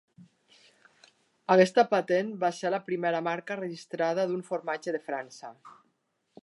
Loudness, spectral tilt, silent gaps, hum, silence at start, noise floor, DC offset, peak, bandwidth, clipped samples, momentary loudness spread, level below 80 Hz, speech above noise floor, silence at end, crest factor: -28 LUFS; -5.5 dB/octave; none; none; 0.2 s; -75 dBFS; under 0.1%; -6 dBFS; 11.5 kHz; under 0.1%; 14 LU; -84 dBFS; 47 dB; 0.7 s; 24 dB